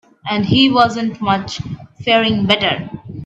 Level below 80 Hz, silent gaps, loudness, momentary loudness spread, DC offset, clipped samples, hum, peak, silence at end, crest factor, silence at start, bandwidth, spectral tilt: -48 dBFS; none; -15 LUFS; 14 LU; under 0.1%; under 0.1%; none; 0 dBFS; 0 s; 16 dB; 0.25 s; 8.4 kHz; -5.5 dB/octave